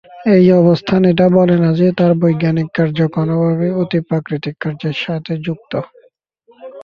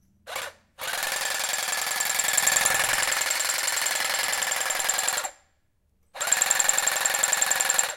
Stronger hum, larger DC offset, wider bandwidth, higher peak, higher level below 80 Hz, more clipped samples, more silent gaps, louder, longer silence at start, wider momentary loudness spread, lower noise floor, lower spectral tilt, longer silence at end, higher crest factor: neither; neither; second, 6 kHz vs 17 kHz; about the same, -2 dBFS vs -4 dBFS; first, -52 dBFS vs -64 dBFS; neither; neither; first, -14 LUFS vs -23 LUFS; about the same, 0.15 s vs 0.25 s; about the same, 12 LU vs 12 LU; second, -53 dBFS vs -68 dBFS; first, -9.5 dB/octave vs 2 dB/octave; about the same, 0 s vs 0 s; second, 12 dB vs 22 dB